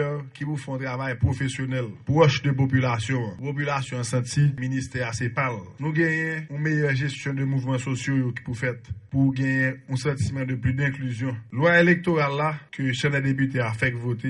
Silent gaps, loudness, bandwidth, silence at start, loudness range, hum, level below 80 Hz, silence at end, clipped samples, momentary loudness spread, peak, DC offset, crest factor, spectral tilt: none; -25 LUFS; 11.5 kHz; 0 s; 3 LU; none; -52 dBFS; 0 s; under 0.1%; 9 LU; -4 dBFS; under 0.1%; 20 dB; -6.5 dB/octave